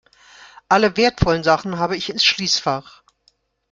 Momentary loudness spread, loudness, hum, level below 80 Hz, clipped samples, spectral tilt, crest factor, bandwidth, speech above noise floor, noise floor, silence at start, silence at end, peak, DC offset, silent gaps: 7 LU; -18 LUFS; none; -40 dBFS; under 0.1%; -4 dB/octave; 18 dB; 9.2 kHz; 44 dB; -62 dBFS; 0.4 s; 0.9 s; -2 dBFS; under 0.1%; none